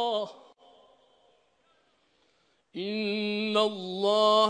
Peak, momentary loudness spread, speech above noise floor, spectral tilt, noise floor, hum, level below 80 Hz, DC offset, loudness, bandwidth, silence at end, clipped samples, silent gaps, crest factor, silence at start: -10 dBFS; 14 LU; 44 dB; -4.5 dB/octave; -70 dBFS; none; -82 dBFS; under 0.1%; -28 LUFS; 10 kHz; 0 s; under 0.1%; none; 20 dB; 0 s